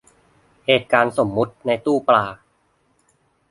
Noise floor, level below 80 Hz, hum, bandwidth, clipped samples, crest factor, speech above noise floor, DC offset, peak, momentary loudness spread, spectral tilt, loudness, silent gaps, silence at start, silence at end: -64 dBFS; -58 dBFS; none; 11.5 kHz; under 0.1%; 22 dB; 45 dB; under 0.1%; 0 dBFS; 7 LU; -5.5 dB/octave; -19 LUFS; none; 0.7 s; 1.15 s